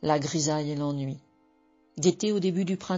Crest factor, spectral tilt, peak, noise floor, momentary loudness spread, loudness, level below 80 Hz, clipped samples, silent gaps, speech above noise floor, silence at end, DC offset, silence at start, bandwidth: 18 dB; -6 dB/octave; -10 dBFS; -64 dBFS; 11 LU; -28 LUFS; -64 dBFS; under 0.1%; none; 37 dB; 0 s; under 0.1%; 0 s; 7.8 kHz